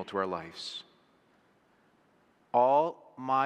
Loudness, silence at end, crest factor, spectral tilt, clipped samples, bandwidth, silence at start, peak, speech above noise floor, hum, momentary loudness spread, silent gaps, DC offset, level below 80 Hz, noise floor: -30 LUFS; 0 s; 20 dB; -5 dB/octave; under 0.1%; 10.5 kHz; 0 s; -12 dBFS; 38 dB; none; 16 LU; none; under 0.1%; -78 dBFS; -67 dBFS